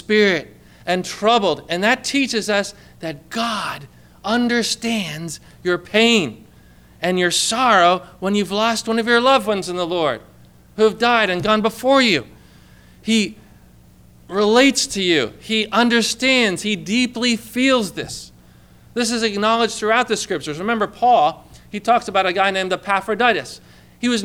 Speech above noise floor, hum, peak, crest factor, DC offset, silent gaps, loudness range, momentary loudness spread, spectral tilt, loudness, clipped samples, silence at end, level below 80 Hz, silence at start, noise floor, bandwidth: 29 dB; 60 Hz at -50 dBFS; -4 dBFS; 16 dB; under 0.1%; none; 4 LU; 12 LU; -3.5 dB/octave; -18 LUFS; under 0.1%; 0 s; -52 dBFS; 0.1 s; -47 dBFS; 17 kHz